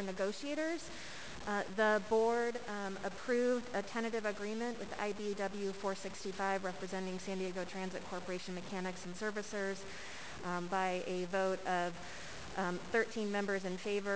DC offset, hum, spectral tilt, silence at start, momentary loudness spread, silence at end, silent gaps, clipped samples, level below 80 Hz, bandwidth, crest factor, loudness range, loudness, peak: 0.4%; none; -4.5 dB/octave; 0 s; 10 LU; 0 s; none; under 0.1%; -68 dBFS; 8 kHz; 18 dB; 6 LU; -38 LUFS; -20 dBFS